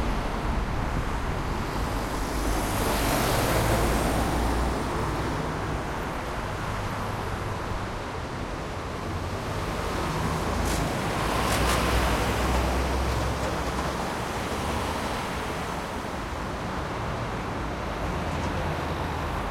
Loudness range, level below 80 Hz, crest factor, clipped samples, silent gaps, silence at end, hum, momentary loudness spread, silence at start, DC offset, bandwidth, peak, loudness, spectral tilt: 6 LU; -34 dBFS; 18 dB; under 0.1%; none; 0 s; none; 8 LU; 0 s; under 0.1%; 16.5 kHz; -10 dBFS; -28 LUFS; -5 dB/octave